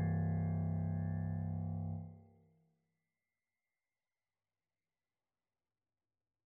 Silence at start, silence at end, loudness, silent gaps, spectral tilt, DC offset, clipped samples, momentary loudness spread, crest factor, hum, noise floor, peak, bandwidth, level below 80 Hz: 0 s; 4.25 s; -39 LUFS; none; -9.5 dB/octave; under 0.1%; under 0.1%; 8 LU; 14 dB; none; under -90 dBFS; -28 dBFS; 2.2 kHz; -66 dBFS